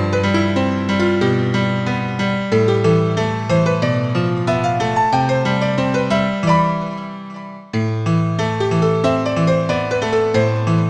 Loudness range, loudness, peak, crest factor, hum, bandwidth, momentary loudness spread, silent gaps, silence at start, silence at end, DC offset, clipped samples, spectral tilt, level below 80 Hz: 2 LU; -17 LUFS; -2 dBFS; 14 dB; none; 9.4 kHz; 5 LU; none; 0 s; 0 s; under 0.1%; under 0.1%; -7 dB/octave; -46 dBFS